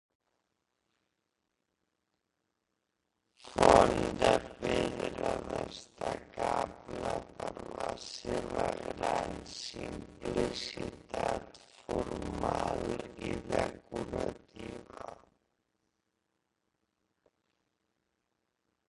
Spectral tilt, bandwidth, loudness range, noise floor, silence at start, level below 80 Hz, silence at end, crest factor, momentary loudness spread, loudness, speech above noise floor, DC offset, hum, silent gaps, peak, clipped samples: -5 dB/octave; 11.5 kHz; 11 LU; -84 dBFS; 3.45 s; -54 dBFS; 3.75 s; 30 dB; 14 LU; -34 LUFS; 50 dB; under 0.1%; none; none; -6 dBFS; under 0.1%